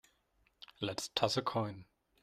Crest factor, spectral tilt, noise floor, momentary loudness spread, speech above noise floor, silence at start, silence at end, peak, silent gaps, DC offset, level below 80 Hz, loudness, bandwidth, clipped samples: 26 dB; -4 dB/octave; -75 dBFS; 22 LU; 39 dB; 0.8 s; 0.4 s; -14 dBFS; none; under 0.1%; -70 dBFS; -36 LUFS; 15 kHz; under 0.1%